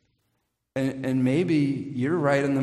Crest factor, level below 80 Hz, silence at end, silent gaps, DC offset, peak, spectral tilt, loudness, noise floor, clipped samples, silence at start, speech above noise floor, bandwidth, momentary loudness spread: 16 dB; -62 dBFS; 0 s; none; under 0.1%; -8 dBFS; -7.5 dB/octave; -25 LUFS; -76 dBFS; under 0.1%; 0.75 s; 52 dB; 12 kHz; 7 LU